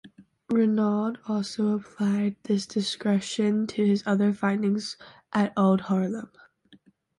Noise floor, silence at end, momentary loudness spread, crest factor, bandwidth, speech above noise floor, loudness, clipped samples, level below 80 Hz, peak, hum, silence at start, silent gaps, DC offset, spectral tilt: -58 dBFS; 0.9 s; 7 LU; 16 dB; 11 kHz; 33 dB; -26 LUFS; under 0.1%; -68 dBFS; -10 dBFS; none; 0.05 s; none; under 0.1%; -6.5 dB/octave